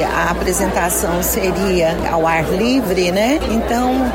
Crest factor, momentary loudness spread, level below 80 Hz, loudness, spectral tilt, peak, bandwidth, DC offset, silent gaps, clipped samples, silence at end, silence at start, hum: 10 dB; 1 LU; -30 dBFS; -16 LUFS; -4.5 dB/octave; -6 dBFS; 16.5 kHz; under 0.1%; none; under 0.1%; 0 s; 0 s; none